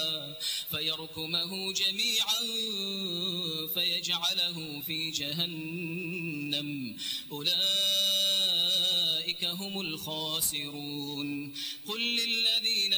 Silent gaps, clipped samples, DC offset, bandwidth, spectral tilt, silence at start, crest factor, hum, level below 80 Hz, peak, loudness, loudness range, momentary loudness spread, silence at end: none; under 0.1%; under 0.1%; over 20 kHz; -2 dB/octave; 0 s; 16 dB; none; -72 dBFS; -14 dBFS; -28 LUFS; 5 LU; 11 LU; 0 s